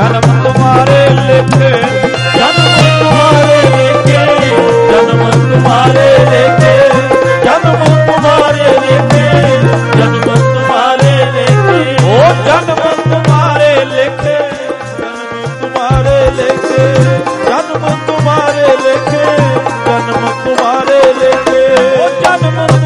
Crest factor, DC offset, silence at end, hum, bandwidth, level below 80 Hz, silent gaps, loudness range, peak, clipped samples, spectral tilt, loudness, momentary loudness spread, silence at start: 8 dB; under 0.1%; 0 s; none; 11.5 kHz; -34 dBFS; none; 4 LU; 0 dBFS; 0.5%; -6 dB/octave; -8 LUFS; 6 LU; 0 s